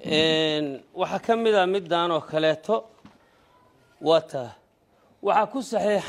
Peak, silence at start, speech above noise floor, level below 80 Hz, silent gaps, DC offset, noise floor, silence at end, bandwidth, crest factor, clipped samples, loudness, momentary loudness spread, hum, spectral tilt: -6 dBFS; 0 s; 38 dB; -68 dBFS; none; under 0.1%; -62 dBFS; 0 s; 12.5 kHz; 18 dB; under 0.1%; -24 LUFS; 10 LU; none; -4.5 dB/octave